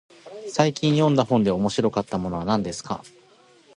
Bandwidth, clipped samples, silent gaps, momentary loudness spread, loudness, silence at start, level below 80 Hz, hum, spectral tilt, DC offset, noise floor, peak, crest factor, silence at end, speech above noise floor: 11 kHz; under 0.1%; none; 14 LU; -23 LUFS; 0.25 s; -52 dBFS; none; -6 dB/octave; under 0.1%; -55 dBFS; -4 dBFS; 20 dB; 0.7 s; 33 dB